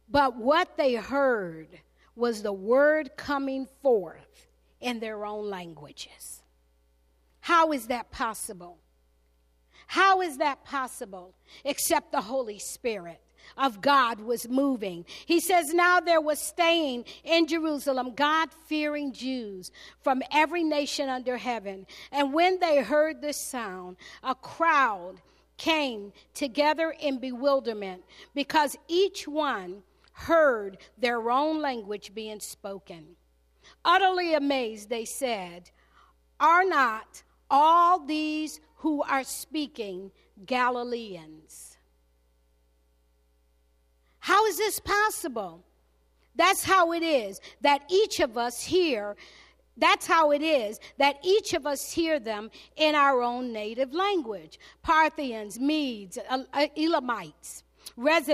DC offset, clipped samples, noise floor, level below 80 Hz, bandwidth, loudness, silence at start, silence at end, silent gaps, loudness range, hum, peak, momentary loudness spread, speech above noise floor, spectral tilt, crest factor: under 0.1%; under 0.1%; -67 dBFS; -62 dBFS; 15 kHz; -26 LUFS; 0.1 s; 0 s; none; 6 LU; none; -8 dBFS; 18 LU; 40 dB; -2.5 dB/octave; 20 dB